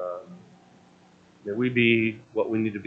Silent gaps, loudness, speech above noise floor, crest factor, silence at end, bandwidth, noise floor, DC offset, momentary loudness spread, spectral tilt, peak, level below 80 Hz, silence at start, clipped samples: none; -25 LUFS; 32 dB; 20 dB; 0 s; 6.4 kHz; -56 dBFS; under 0.1%; 17 LU; -8 dB/octave; -8 dBFS; -68 dBFS; 0 s; under 0.1%